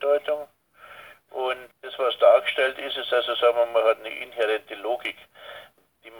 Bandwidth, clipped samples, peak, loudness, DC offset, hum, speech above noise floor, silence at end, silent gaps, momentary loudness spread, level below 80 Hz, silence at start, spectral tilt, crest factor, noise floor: 19.5 kHz; under 0.1%; -6 dBFS; -24 LUFS; under 0.1%; none; 27 dB; 0 s; none; 23 LU; -74 dBFS; 0 s; -2.5 dB/octave; 20 dB; -51 dBFS